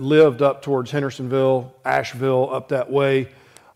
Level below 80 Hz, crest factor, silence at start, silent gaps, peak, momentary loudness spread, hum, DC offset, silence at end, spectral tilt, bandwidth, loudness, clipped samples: -62 dBFS; 16 dB; 0 s; none; -4 dBFS; 8 LU; none; under 0.1%; 0.45 s; -7 dB/octave; 13.5 kHz; -20 LUFS; under 0.1%